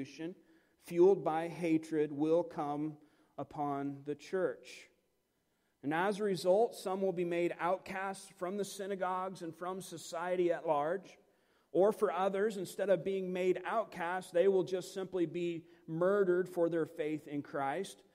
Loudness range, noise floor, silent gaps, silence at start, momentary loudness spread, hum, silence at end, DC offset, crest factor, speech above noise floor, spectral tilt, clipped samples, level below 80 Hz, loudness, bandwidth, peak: 4 LU; -79 dBFS; none; 0 s; 12 LU; none; 0.2 s; under 0.1%; 18 dB; 45 dB; -6 dB/octave; under 0.1%; -80 dBFS; -35 LUFS; 16 kHz; -18 dBFS